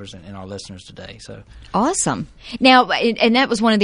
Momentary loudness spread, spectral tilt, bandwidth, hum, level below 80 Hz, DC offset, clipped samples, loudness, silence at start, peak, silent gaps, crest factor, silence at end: 24 LU; -3.5 dB/octave; 10.5 kHz; none; -48 dBFS; under 0.1%; under 0.1%; -16 LUFS; 0 s; 0 dBFS; none; 18 dB; 0 s